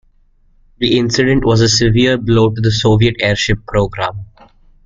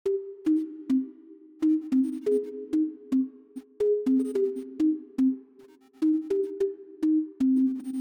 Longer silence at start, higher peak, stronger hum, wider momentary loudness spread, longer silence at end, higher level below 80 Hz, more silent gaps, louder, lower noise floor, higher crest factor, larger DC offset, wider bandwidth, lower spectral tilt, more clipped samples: first, 0.8 s vs 0.05 s; first, 0 dBFS vs -16 dBFS; neither; about the same, 8 LU vs 6 LU; first, 0.6 s vs 0 s; first, -32 dBFS vs -70 dBFS; neither; first, -13 LUFS vs -27 LUFS; about the same, -51 dBFS vs -54 dBFS; about the same, 14 dB vs 10 dB; neither; second, 7.6 kHz vs 9.8 kHz; second, -5 dB/octave vs -7 dB/octave; neither